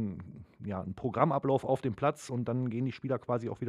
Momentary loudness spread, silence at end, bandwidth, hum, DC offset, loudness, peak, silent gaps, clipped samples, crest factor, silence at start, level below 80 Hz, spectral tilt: 11 LU; 0 s; 12 kHz; none; under 0.1%; -33 LUFS; -10 dBFS; none; under 0.1%; 22 dB; 0 s; -64 dBFS; -8 dB/octave